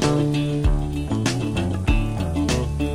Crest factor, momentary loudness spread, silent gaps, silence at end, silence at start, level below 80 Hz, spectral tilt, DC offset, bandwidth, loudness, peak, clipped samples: 16 dB; 3 LU; none; 0 s; 0 s; -26 dBFS; -6 dB/octave; 0.5%; 15 kHz; -23 LUFS; -6 dBFS; under 0.1%